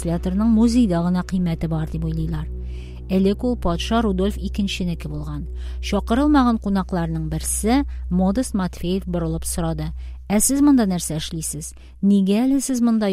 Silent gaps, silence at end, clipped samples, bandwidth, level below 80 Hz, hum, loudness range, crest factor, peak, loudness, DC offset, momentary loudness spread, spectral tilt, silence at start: none; 0 s; under 0.1%; 16 kHz; -30 dBFS; none; 3 LU; 16 dB; -4 dBFS; -21 LUFS; under 0.1%; 13 LU; -5.5 dB/octave; 0 s